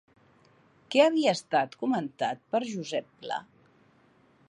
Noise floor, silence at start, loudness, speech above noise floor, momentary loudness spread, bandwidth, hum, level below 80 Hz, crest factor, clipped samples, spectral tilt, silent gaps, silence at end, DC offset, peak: -63 dBFS; 0.9 s; -28 LUFS; 35 dB; 14 LU; 11 kHz; none; -80 dBFS; 20 dB; under 0.1%; -4.5 dB/octave; none; 1.05 s; under 0.1%; -10 dBFS